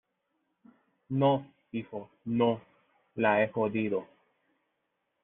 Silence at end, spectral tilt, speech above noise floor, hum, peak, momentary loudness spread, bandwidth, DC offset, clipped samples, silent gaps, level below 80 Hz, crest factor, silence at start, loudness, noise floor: 1.2 s; -5.5 dB/octave; 51 dB; none; -12 dBFS; 14 LU; 4 kHz; under 0.1%; under 0.1%; none; -72 dBFS; 20 dB; 1.1 s; -30 LUFS; -80 dBFS